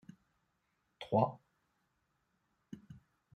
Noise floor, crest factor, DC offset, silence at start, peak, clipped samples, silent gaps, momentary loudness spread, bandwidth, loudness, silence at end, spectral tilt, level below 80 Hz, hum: -81 dBFS; 26 dB; under 0.1%; 1 s; -18 dBFS; under 0.1%; none; 22 LU; 9.2 kHz; -35 LUFS; 0.45 s; -9 dB/octave; -78 dBFS; none